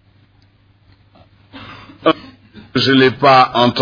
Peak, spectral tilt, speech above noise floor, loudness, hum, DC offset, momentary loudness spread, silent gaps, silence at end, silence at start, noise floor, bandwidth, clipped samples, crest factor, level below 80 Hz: 0 dBFS; -6 dB/octave; 41 dB; -13 LUFS; none; under 0.1%; 25 LU; none; 0 s; 1.55 s; -52 dBFS; 5.2 kHz; under 0.1%; 16 dB; -52 dBFS